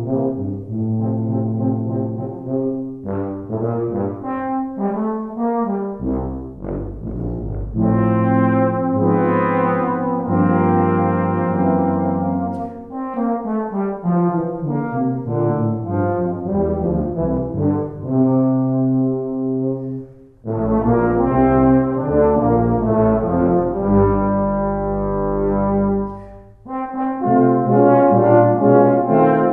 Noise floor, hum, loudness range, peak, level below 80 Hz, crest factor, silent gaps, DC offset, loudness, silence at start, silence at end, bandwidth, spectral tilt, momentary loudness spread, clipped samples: -38 dBFS; none; 7 LU; -2 dBFS; -36 dBFS; 16 dB; none; under 0.1%; -18 LUFS; 0 s; 0 s; 3.3 kHz; -12.5 dB/octave; 11 LU; under 0.1%